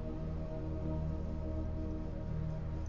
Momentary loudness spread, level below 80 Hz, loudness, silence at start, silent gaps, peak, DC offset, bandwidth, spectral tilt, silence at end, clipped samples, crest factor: 3 LU; -42 dBFS; -41 LUFS; 0 s; none; -26 dBFS; under 0.1%; 7 kHz; -9.5 dB/octave; 0 s; under 0.1%; 12 dB